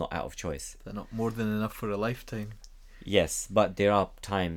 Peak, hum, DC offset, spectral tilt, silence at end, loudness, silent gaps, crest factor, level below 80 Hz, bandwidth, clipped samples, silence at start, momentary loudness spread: -8 dBFS; none; under 0.1%; -5 dB/octave; 0 s; -30 LUFS; none; 24 dB; -48 dBFS; 18.5 kHz; under 0.1%; 0 s; 14 LU